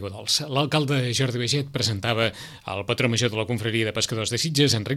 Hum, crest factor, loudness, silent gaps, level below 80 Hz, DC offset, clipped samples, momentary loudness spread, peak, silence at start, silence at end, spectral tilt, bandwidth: none; 18 dB; -23 LUFS; none; -58 dBFS; under 0.1%; under 0.1%; 5 LU; -6 dBFS; 0 s; 0 s; -4 dB/octave; 15.5 kHz